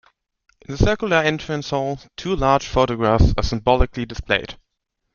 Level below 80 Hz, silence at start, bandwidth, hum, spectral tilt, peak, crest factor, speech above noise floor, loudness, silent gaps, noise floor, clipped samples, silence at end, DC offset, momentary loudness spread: -28 dBFS; 0.7 s; 7.2 kHz; none; -6 dB/octave; -2 dBFS; 18 dB; 57 dB; -20 LUFS; none; -76 dBFS; under 0.1%; 0.6 s; under 0.1%; 10 LU